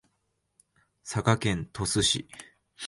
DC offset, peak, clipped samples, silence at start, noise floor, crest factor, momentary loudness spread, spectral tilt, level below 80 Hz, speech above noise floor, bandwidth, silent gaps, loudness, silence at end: under 0.1%; -6 dBFS; under 0.1%; 1.05 s; -77 dBFS; 24 dB; 21 LU; -3.5 dB/octave; -50 dBFS; 49 dB; 11.5 kHz; none; -27 LUFS; 0 s